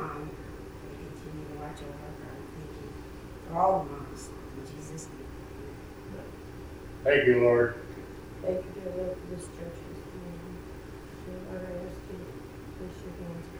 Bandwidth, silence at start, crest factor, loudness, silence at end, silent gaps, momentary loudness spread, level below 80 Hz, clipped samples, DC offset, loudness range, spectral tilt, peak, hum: over 20 kHz; 0 s; 24 dB; -33 LUFS; 0 s; none; 18 LU; -50 dBFS; under 0.1%; under 0.1%; 13 LU; -6 dB/octave; -10 dBFS; none